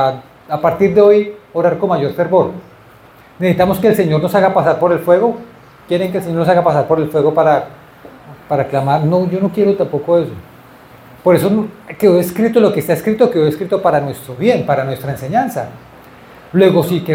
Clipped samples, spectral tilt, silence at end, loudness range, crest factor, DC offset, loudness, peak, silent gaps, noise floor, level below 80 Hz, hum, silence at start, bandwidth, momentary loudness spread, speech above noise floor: under 0.1%; -7.5 dB/octave; 0 s; 2 LU; 14 dB; under 0.1%; -14 LUFS; 0 dBFS; none; -42 dBFS; -50 dBFS; none; 0 s; 17 kHz; 9 LU; 29 dB